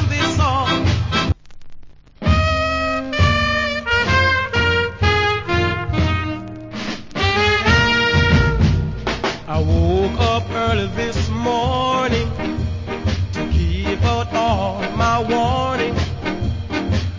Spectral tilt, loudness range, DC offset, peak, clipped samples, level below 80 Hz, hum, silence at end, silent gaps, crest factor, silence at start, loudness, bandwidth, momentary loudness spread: -5.5 dB/octave; 3 LU; under 0.1%; -2 dBFS; under 0.1%; -26 dBFS; none; 0 s; none; 16 dB; 0 s; -18 LUFS; 7.6 kHz; 9 LU